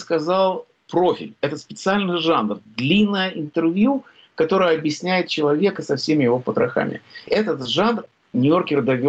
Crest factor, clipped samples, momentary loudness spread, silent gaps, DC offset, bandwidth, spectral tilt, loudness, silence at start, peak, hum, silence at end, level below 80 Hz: 12 dB; under 0.1%; 9 LU; none; under 0.1%; 8.4 kHz; -6 dB/octave; -20 LUFS; 0 s; -8 dBFS; none; 0 s; -60 dBFS